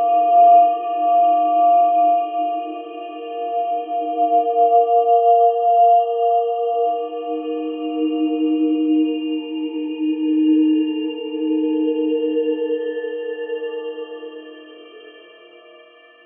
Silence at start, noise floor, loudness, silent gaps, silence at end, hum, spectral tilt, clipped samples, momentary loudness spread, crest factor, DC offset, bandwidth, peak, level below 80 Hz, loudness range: 0 s; -47 dBFS; -18 LUFS; none; 1.05 s; none; -8.5 dB/octave; under 0.1%; 13 LU; 14 dB; under 0.1%; 3.4 kHz; -4 dBFS; under -90 dBFS; 8 LU